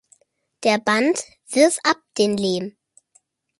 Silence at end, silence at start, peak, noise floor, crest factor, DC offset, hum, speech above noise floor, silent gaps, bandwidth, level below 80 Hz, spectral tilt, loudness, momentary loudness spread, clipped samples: 0.9 s; 0.6 s; -2 dBFS; -62 dBFS; 20 dB; under 0.1%; none; 42 dB; none; 11.5 kHz; -68 dBFS; -3.5 dB/octave; -20 LUFS; 9 LU; under 0.1%